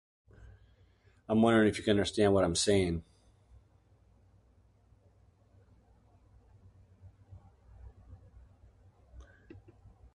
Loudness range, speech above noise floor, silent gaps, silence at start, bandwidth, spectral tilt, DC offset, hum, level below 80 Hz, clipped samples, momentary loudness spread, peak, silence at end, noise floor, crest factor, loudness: 7 LU; 38 dB; none; 1.3 s; 11.5 kHz; -5 dB/octave; under 0.1%; none; -54 dBFS; under 0.1%; 9 LU; -12 dBFS; 0.9 s; -65 dBFS; 22 dB; -28 LUFS